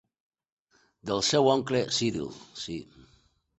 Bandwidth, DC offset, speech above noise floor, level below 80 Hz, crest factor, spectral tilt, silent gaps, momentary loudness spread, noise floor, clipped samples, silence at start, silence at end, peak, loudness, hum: 8.4 kHz; under 0.1%; 37 dB; -62 dBFS; 22 dB; -4 dB/octave; none; 16 LU; -65 dBFS; under 0.1%; 1.05 s; 0.75 s; -10 dBFS; -27 LUFS; none